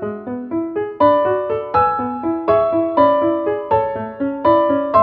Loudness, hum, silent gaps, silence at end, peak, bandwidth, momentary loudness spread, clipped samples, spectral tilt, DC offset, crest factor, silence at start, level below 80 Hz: -17 LUFS; none; none; 0 s; -2 dBFS; 5 kHz; 9 LU; under 0.1%; -10 dB/octave; under 0.1%; 16 dB; 0 s; -48 dBFS